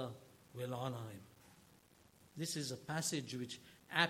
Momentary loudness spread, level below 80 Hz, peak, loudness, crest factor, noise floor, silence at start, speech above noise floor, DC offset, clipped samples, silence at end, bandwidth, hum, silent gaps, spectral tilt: 19 LU; -80 dBFS; -16 dBFS; -43 LUFS; 28 dB; -67 dBFS; 0 s; 24 dB; under 0.1%; under 0.1%; 0 s; 16.5 kHz; none; none; -3.5 dB/octave